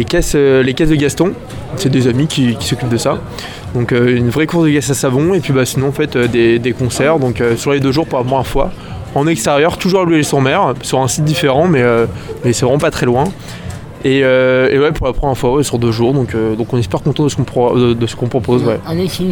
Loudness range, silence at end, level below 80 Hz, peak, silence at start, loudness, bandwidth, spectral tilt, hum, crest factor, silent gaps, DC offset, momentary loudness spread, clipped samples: 2 LU; 0 s; -32 dBFS; 0 dBFS; 0 s; -13 LUFS; 19.5 kHz; -5.5 dB/octave; none; 12 dB; none; under 0.1%; 7 LU; under 0.1%